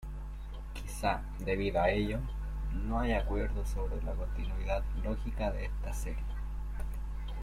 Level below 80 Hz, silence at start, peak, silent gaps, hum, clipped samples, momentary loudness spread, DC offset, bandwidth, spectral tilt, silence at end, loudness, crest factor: -36 dBFS; 0 s; -16 dBFS; none; none; under 0.1%; 10 LU; under 0.1%; 13.5 kHz; -6.5 dB/octave; 0 s; -36 LUFS; 18 dB